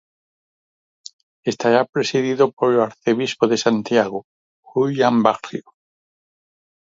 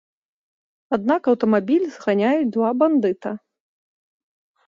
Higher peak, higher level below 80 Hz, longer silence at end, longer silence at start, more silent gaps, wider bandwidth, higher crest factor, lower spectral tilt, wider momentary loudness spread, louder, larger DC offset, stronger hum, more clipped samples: first, 0 dBFS vs -6 dBFS; about the same, -68 dBFS vs -68 dBFS; about the same, 1.35 s vs 1.3 s; first, 1.45 s vs 0.9 s; first, 1.89-1.93 s, 2.53-2.57 s, 4.24-4.63 s vs none; about the same, 7.8 kHz vs 7.4 kHz; about the same, 20 dB vs 16 dB; second, -5 dB/octave vs -7.5 dB/octave; about the same, 11 LU vs 9 LU; about the same, -19 LUFS vs -20 LUFS; neither; neither; neither